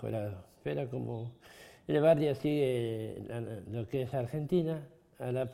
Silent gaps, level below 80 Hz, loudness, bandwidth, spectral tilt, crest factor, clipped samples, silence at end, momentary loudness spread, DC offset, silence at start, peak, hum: none; -64 dBFS; -34 LUFS; 16 kHz; -8 dB/octave; 20 dB; under 0.1%; 0 s; 15 LU; under 0.1%; 0 s; -14 dBFS; none